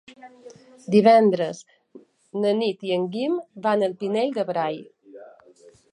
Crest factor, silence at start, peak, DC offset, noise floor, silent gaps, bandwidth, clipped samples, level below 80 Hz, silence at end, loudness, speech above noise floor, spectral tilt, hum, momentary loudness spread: 20 dB; 0.1 s; -4 dBFS; under 0.1%; -53 dBFS; none; 10.5 kHz; under 0.1%; -76 dBFS; 0.65 s; -22 LUFS; 31 dB; -6.5 dB/octave; none; 15 LU